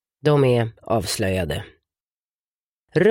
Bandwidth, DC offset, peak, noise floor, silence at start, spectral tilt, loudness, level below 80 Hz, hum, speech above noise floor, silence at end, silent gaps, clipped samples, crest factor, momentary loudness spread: 16.5 kHz; under 0.1%; -4 dBFS; under -90 dBFS; 0.25 s; -6 dB/octave; -21 LUFS; -46 dBFS; none; over 70 dB; 0 s; 2.00-2.87 s; under 0.1%; 18 dB; 9 LU